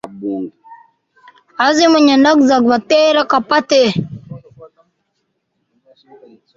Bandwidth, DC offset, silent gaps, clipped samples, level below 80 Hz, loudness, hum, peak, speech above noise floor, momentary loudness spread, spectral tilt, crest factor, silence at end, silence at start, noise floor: 7.6 kHz; under 0.1%; none; under 0.1%; -58 dBFS; -12 LUFS; none; 0 dBFS; 57 dB; 20 LU; -4.5 dB/octave; 14 dB; 1.9 s; 0.05 s; -69 dBFS